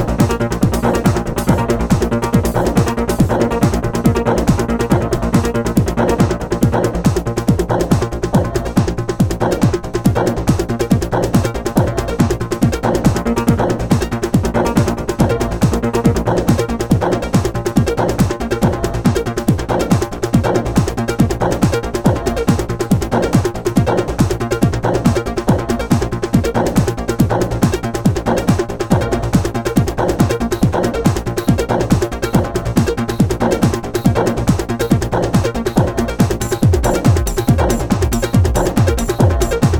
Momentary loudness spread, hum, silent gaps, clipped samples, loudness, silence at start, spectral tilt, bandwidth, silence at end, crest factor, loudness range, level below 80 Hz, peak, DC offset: 2 LU; none; none; under 0.1%; -16 LUFS; 0 s; -6.5 dB/octave; 18 kHz; 0 s; 14 dB; 1 LU; -26 dBFS; 0 dBFS; 0.2%